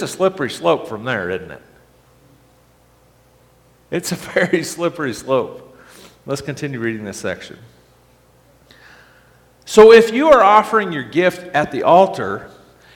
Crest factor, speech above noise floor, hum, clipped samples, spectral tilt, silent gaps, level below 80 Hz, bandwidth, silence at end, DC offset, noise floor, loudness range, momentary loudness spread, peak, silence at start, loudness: 18 dB; 37 dB; 60 Hz at -55 dBFS; under 0.1%; -5 dB/octave; none; -52 dBFS; 17 kHz; 0.5 s; under 0.1%; -53 dBFS; 16 LU; 17 LU; 0 dBFS; 0 s; -15 LUFS